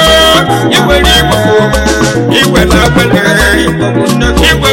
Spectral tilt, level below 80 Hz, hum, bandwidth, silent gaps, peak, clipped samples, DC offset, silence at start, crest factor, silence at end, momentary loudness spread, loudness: -4 dB/octave; -18 dBFS; none; 17 kHz; none; 0 dBFS; under 0.1%; under 0.1%; 0 s; 6 dB; 0 s; 4 LU; -7 LUFS